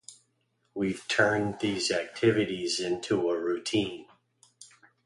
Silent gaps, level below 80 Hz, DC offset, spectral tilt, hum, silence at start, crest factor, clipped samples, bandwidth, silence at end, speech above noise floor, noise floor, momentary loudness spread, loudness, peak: none; -62 dBFS; under 0.1%; -4 dB/octave; none; 0.1 s; 24 dB; under 0.1%; 11.5 kHz; 0.4 s; 46 dB; -74 dBFS; 7 LU; -28 LUFS; -6 dBFS